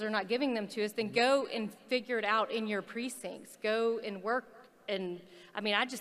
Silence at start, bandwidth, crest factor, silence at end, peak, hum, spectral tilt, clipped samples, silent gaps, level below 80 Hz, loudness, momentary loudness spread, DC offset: 0 s; 15 kHz; 20 dB; 0 s; -14 dBFS; none; -4 dB/octave; under 0.1%; none; -82 dBFS; -33 LUFS; 11 LU; under 0.1%